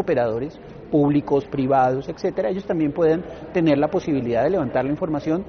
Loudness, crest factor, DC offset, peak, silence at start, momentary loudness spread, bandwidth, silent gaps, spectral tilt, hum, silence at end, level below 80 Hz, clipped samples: -21 LUFS; 14 dB; under 0.1%; -6 dBFS; 0 s; 6 LU; 6.6 kHz; none; -7 dB/octave; none; 0 s; -48 dBFS; under 0.1%